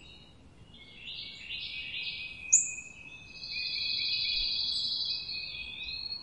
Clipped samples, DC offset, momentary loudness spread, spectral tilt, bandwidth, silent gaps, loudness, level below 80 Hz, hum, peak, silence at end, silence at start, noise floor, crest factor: under 0.1%; under 0.1%; 18 LU; 2 dB/octave; 11.5 kHz; none; -31 LUFS; -58 dBFS; none; -10 dBFS; 0 s; 0 s; -55 dBFS; 24 dB